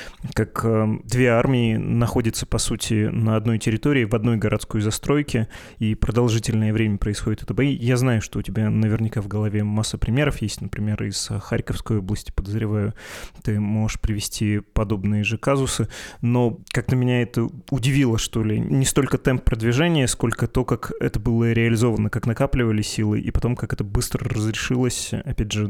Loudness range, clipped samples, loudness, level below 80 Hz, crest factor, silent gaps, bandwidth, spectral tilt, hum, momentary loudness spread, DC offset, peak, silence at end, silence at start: 4 LU; under 0.1%; -22 LUFS; -34 dBFS; 18 dB; none; 15.5 kHz; -6 dB/octave; none; 7 LU; under 0.1%; -4 dBFS; 0 s; 0 s